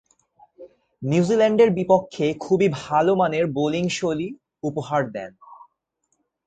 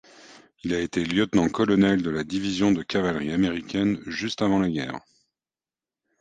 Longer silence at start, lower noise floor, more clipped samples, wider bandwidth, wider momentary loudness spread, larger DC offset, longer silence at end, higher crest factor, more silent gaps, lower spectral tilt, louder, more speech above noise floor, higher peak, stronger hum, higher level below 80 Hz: first, 0.6 s vs 0.3 s; second, -73 dBFS vs under -90 dBFS; neither; about the same, 9.2 kHz vs 9.4 kHz; first, 14 LU vs 8 LU; neither; second, 0.95 s vs 1.2 s; about the same, 18 dB vs 18 dB; neither; about the same, -6.5 dB/octave vs -6 dB/octave; first, -21 LUFS vs -24 LUFS; second, 53 dB vs over 66 dB; first, -4 dBFS vs -8 dBFS; neither; second, -60 dBFS vs -52 dBFS